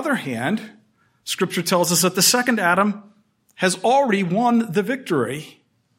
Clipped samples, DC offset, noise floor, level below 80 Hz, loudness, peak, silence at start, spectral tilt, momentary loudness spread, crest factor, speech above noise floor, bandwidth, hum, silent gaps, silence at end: under 0.1%; under 0.1%; -57 dBFS; -70 dBFS; -19 LUFS; -2 dBFS; 0 s; -3.5 dB/octave; 12 LU; 20 dB; 37 dB; 16.5 kHz; none; none; 0.5 s